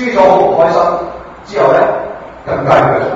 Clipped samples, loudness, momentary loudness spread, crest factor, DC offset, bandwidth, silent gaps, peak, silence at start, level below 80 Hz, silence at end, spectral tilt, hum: 0.2%; -11 LUFS; 17 LU; 12 dB; under 0.1%; 7.8 kHz; none; 0 dBFS; 0 s; -42 dBFS; 0 s; -6.5 dB/octave; none